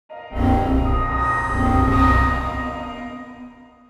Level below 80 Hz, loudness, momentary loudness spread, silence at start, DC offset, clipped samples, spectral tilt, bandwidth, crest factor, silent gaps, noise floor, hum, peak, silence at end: -26 dBFS; -19 LUFS; 17 LU; 0.1 s; under 0.1%; under 0.1%; -7.5 dB/octave; 11.5 kHz; 16 dB; none; -42 dBFS; none; -4 dBFS; 0.35 s